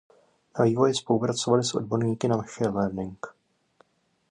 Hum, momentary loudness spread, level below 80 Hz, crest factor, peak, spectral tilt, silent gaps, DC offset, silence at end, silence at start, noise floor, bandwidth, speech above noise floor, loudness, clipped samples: none; 14 LU; -60 dBFS; 18 dB; -8 dBFS; -5.5 dB/octave; none; under 0.1%; 1 s; 0.55 s; -64 dBFS; 10.5 kHz; 39 dB; -26 LUFS; under 0.1%